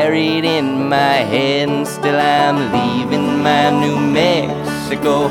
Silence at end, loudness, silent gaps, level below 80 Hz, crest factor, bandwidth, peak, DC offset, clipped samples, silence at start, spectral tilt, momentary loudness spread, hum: 0 s; -15 LUFS; none; -50 dBFS; 14 dB; 16.5 kHz; 0 dBFS; under 0.1%; under 0.1%; 0 s; -5.5 dB/octave; 5 LU; none